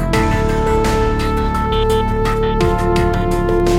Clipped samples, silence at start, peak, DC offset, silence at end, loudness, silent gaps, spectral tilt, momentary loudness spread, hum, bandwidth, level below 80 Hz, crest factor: under 0.1%; 0 s; -2 dBFS; under 0.1%; 0 s; -16 LUFS; none; -6.5 dB/octave; 2 LU; none; 16 kHz; -20 dBFS; 12 dB